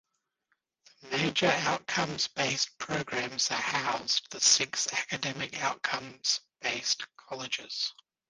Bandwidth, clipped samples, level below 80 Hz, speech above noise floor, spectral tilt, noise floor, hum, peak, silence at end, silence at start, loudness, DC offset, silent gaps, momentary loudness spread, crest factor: 10.5 kHz; under 0.1%; -70 dBFS; 48 dB; -1.5 dB/octave; -79 dBFS; none; -10 dBFS; 0.4 s; 1.05 s; -29 LUFS; under 0.1%; none; 9 LU; 22 dB